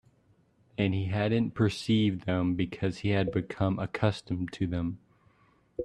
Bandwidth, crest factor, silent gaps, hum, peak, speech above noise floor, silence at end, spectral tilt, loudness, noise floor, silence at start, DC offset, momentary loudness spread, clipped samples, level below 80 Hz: 10.5 kHz; 20 dB; none; none; -10 dBFS; 37 dB; 0 s; -7 dB/octave; -30 LUFS; -66 dBFS; 0.8 s; under 0.1%; 8 LU; under 0.1%; -56 dBFS